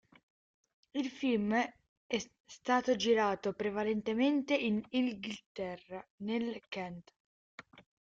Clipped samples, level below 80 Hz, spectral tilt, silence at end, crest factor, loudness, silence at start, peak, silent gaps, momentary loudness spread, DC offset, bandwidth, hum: under 0.1%; -72 dBFS; -5 dB/octave; 0.35 s; 18 dB; -34 LUFS; 0.95 s; -16 dBFS; 1.89-2.09 s, 2.40-2.44 s, 5.46-5.55 s, 6.10-6.18 s, 7.16-7.58 s; 14 LU; under 0.1%; 7.8 kHz; none